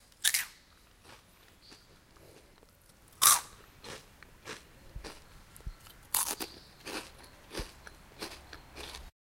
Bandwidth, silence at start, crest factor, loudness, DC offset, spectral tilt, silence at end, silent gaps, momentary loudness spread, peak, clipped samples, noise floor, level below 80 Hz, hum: 16.5 kHz; 0.2 s; 36 dB; -30 LUFS; under 0.1%; 0 dB/octave; 0.1 s; none; 27 LU; -2 dBFS; under 0.1%; -61 dBFS; -56 dBFS; none